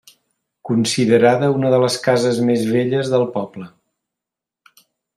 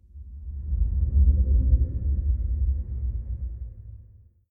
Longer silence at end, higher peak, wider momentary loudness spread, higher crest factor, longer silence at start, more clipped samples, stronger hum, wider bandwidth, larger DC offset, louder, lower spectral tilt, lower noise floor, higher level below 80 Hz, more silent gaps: first, 1.5 s vs 0.45 s; first, -2 dBFS vs -8 dBFS; second, 12 LU vs 19 LU; about the same, 16 dB vs 16 dB; first, 0.65 s vs 0.15 s; neither; neither; first, 14.5 kHz vs 0.7 kHz; neither; first, -17 LUFS vs -26 LUFS; second, -5.5 dB/octave vs -14.5 dB/octave; first, -86 dBFS vs -52 dBFS; second, -62 dBFS vs -24 dBFS; neither